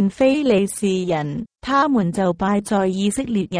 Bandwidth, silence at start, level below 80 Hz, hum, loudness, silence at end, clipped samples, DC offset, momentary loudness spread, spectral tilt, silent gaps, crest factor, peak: 11 kHz; 0 s; -50 dBFS; none; -19 LUFS; 0 s; under 0.1%; under 0.1%; 6 LU; -6 dB/octave; none; 14 dB; -4 dBFS